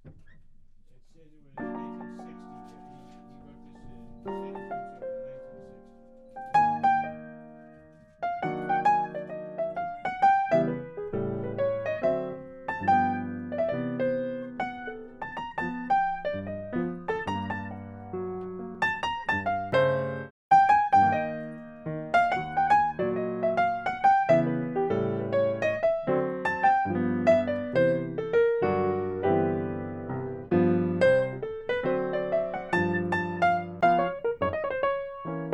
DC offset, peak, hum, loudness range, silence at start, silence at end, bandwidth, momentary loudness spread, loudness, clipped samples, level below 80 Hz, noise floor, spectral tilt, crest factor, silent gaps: under 0.1%; -10 dBFS; none; 16 LU; 0.05 s; 0 s; 9.8 kHz; 15 LU; -27 LUFS; under 0.1%; -58 dBFS; -53 dBFS; -7.5 dB/octave; 18 dB; 20.30-20.51 s